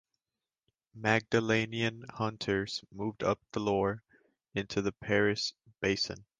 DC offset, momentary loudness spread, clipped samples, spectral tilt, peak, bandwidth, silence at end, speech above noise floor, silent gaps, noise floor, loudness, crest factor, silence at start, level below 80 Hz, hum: under 0.1%; 8 LU; under 0.1%; -5 dB/octave; -10 dBFS; 9.8 kHz; 0.15 s; over 58 dB; none; under -90 dBFS; -32 LUFS; 22 dB; 0.95 s; -60 dBFS; none